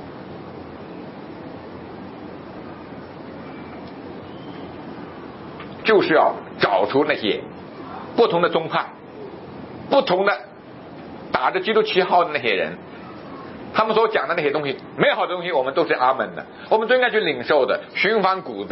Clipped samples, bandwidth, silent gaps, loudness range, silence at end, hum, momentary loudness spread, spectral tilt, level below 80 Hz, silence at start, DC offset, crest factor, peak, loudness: under 0.1%; 5.8 kHz; none; 16 LU; 0 s; none; 19 LU; -9 dB/octave; -62 dBFS; 0 s; under 0.1%; 20 dB; -2 dBFS; -20 LUFS